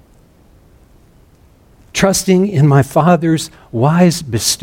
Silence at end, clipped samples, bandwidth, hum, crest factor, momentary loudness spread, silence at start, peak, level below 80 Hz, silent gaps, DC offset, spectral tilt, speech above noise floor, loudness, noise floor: 0.05 s; under 0.1%; 17 kHz; none; 14 dB; 7 LU; 1.95 s; 0 dBFS; -44 dBFS; none; under 0.1%; -5.5 dB/octave; 35 dB; -13 LUFS; -47 dBFS